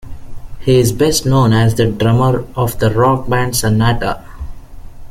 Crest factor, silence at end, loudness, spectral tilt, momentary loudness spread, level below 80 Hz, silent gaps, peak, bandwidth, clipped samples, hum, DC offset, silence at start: 12 dB; 0.05 s; -14 LUFS; -5.5 dB/octave; 10 LU; -30 dBFS; none; -2 dBFS; 16 kHz; under 0.1%; none; under 0.1%; 0.05 s